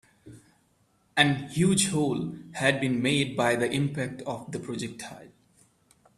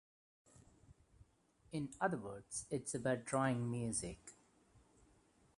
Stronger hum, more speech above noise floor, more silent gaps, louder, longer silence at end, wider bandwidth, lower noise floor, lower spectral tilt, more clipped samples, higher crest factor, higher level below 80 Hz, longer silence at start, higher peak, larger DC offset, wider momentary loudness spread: neither; first, 40 dB vs 32 dB; neither; first, -27 LUFS vs -41 LUFS; second, 0.9 s vs 1.25 s; first, 14 kHz vs 11.5 kHz; second, -67 dBFS vs -72 dBFS; about the same, -4.5 dB/octave vs -5 dB/octave; neither; about the same, 24 dB vs 22 dB; first, -62 dBFS vs -68 dBFS; second, 0.25 s vs 0.55 s; first, -6 dBFS vs -22 dBFS; neither; about the same, 13 LU vs 12 LU